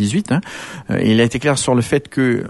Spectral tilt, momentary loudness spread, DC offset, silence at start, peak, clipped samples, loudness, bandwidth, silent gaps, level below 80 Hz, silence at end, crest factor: -5.5 dB/octave; 8 LU; under 0.1%; 0 s; -2 dBFS; under 0.1%; -17 LUFS; 12 kHz; none; -46 dBFS; 0 s; 14 dB